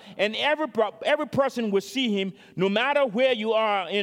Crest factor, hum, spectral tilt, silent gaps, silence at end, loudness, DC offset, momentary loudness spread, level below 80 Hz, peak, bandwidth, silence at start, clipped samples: 16 dB; none; -5 dB/octave; none; 0 s; -24 LUFS; under 0.1%; 4 LU; -72 dBFS; -8 dBFS; 16.5 kHz; 0.05 s; under 0.1%